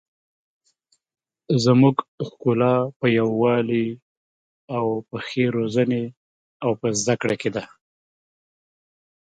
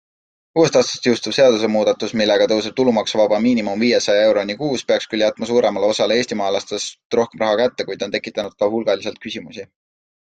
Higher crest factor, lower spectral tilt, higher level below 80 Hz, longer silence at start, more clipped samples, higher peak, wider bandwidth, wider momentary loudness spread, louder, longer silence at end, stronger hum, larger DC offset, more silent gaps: about the same, 20 dB vs 16 dB; first, -6 dB/octave vs -4 dB/octave; about the same, -64 dBFS vs -60 dBFS; first, 1.5 s vs 0.55 s; neither; about the same, -4 dBFS vs -2 dBFS; about the same, 9.4 kHz vs 9.2 kHz; about the same, 11 LU vs 10 LU; second, -22 LUFS vs -18 LUFS; first, 1.75 s vs 0.55 s; neither; neither; first, 2.08-2.18 s, 2.96-3.00 s, 4.02-4.68 s, 6.17-6.60 s vs 7.05-7.10 s